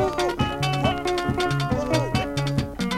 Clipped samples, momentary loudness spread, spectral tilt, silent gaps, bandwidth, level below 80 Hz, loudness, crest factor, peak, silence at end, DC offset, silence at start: under 0.1%; 2 LU; -5.5 dB/octave; none; 15.5 kHz; -38 dBFS; -24 LUFS; 18 dB; -6 dBFS; 0 s; under 0.1%; 0 s